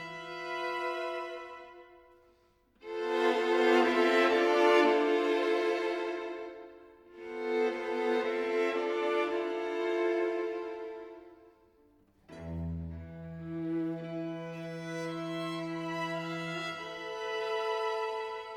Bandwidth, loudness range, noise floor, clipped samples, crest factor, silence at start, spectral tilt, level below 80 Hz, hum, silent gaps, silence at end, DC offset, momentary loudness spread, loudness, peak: 12 kHz; 12 LU; -68 dBFS; under 0.1%; 18 dB; 0 s; -5.5 dB/octave; -62 dBFS; none; none; 0 s; under 0.1%; 18 LU; -32 LUFS; -14 dBFS